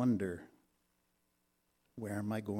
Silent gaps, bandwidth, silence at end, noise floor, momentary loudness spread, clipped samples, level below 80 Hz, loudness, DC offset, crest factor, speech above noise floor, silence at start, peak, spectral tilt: none; 15.5 kHz; 0 s; -79 dBFS; 14 LU; under 0.1%; -76 dBFS; -39 LUFS; under 0.1%; 18 dB; 43 dB; 0 s; -22 dBFS; -7.5 dB/octave